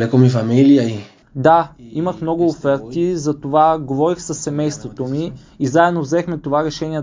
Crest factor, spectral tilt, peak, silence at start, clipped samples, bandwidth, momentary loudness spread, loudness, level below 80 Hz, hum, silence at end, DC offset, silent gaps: 16 dB; -7 dB/octave; 0 dBFS; 0 s; under 0.1%; 7.6 kHz; 10 LU; -17 LUFS; -50 dBFS; none; 0 s; under 0.1%; none